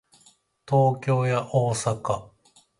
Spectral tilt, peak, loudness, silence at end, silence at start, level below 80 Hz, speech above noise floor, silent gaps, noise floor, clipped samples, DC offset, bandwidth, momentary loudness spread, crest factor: -6 dB/octave; -8 dBFS; -24 LUFS; 0.55 s; 0.7 s; -58 dBFS; 37 dB; none; -60 dBFS; under 0.1%; under 0.1%; 11.5 kHz; 8 LU; 18 dB